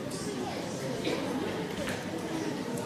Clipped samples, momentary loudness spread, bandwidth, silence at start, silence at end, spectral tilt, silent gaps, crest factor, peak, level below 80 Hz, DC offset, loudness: under 0.1%; 3 LU; 16 kHz; 0 s; 0 s; -4.5 dB/octave; none; 16 dB; -18 dBFS; -58 dBFS; under 0.1%; -34 LUFS